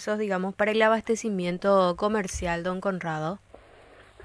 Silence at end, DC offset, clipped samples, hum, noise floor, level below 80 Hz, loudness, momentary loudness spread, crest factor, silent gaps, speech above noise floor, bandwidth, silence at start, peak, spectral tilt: 0 s; under 0.1%; under 0.1%; none; -52 dBFS; -50 dBFS; -26 LUFS; 8 LU; 18 dB; none; 27 dB; 11 kHz; 0 s; -8 dBFS; -5 dB/octave